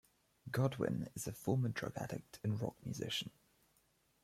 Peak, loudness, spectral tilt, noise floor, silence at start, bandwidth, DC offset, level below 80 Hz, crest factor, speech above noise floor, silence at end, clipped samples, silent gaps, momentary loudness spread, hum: -22 dBFS; -40 LUFS; -5.5 dB/octave; -76 dBFS; 0.45 s; 15.5 kHz; under 0.1%; -70 dBFS; 20 dB; 36 dB; 0.95 s; under 0.1%; none; 8 LU; none